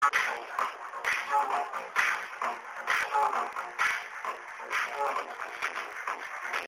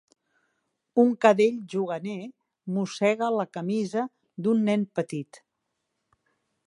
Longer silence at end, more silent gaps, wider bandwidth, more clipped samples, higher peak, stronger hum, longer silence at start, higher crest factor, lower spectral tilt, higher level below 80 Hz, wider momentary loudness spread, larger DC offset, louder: second, 0 s vs 1.3 s; neither; first, 16 kHz vs 11.5 kHz; neither; second, -12 dBFS vs -4 dBFS; neither; second, 0 s vs 0.95 s; about the same, 20 dB vs 24 dB; second, 0 dB/octave vs -6.5 dB/octave; about the same, -76 dBFS vs -78 dBFS; second, 8 LU vs 16 LU; neither; second, -31 LUFS vs -26 LUFS